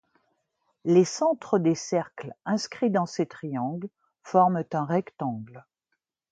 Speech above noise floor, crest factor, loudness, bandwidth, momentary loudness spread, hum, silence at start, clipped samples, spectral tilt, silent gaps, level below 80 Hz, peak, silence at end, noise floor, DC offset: 55 dB; 20 dB; -26 LUFS; 9.2 kHz; 16 LU; none; 0.85 s; under 0.1%; -6 dB/octave; none; -74 dBFS; -6 dBFS; 0.7 s; -80 dBFS; under 0.1%